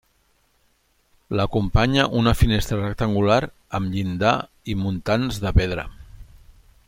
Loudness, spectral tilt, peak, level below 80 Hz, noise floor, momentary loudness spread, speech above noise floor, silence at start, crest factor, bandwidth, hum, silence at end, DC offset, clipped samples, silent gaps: -22 LUFS; -6.5 dB/octave; -2 dBFS; -32 dBFS; -64 dBFS; 9 LU; 43 dB; 1.3 s; 22 dB; 16.5 kHz; none; 0.35 s; under 0.1%; under 0.1%; none